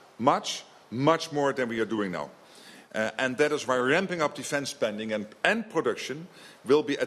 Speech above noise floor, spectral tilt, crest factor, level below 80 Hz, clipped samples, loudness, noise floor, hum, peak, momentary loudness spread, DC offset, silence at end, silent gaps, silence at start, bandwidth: 23 dB; -4.5 dB/octave; 24 dB; -72 dBFS; under 0.1%; -28 LUFS; -51 dBFS; none; -4 dBFS; 12 LU; under 0.1%; 0 s; none; 0.2 s; 13.5 kHz